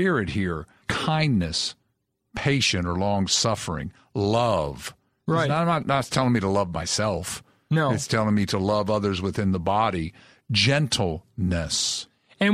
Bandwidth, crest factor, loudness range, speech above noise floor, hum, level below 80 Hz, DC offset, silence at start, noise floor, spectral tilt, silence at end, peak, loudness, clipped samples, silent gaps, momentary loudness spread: 15 kHz; 18 dB; 1 LU; 51 dB; none; -46 dBFS; under 0.1%; 0 s; -75 dBFS; -4.5 dB/octave; 0 s; -6 dBFS; -24 LUFS; under 0.1%; none; 10 LU